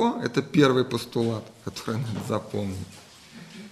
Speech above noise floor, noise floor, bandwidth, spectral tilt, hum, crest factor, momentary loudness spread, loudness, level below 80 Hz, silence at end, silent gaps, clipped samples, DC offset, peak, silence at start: 21 dB; -46 dBFS; 13 kHz; -6 dB/octave; none; 20 dB; 23 LU; -26 LUFS; -62 dBFS; 0 s; none; under 0.1%; under 0.1%; -6 dBFS; 0 s